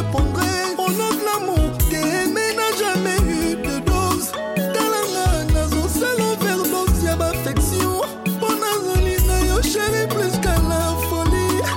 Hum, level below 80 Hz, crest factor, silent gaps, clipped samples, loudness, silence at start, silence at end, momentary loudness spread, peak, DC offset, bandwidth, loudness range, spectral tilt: none; -26 dBFS; 12 dB; none; under 0.1%; -20 LUFS; 0 s; 0 s; 2 LU; -8 dBFS; under 0.1%; 17 kHz; 1 LU; -4.5 dB/octave